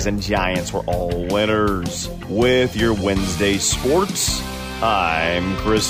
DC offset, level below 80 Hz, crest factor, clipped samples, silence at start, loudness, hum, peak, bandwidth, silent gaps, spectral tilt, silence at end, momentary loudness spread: under 0.1%; -34 dBFS; 14 dB; under 0.1%; 0 s; -19 LUFS; none; -4 dBFS; 16 kHz; none; -4 dB/octave; 0 s; 6 LU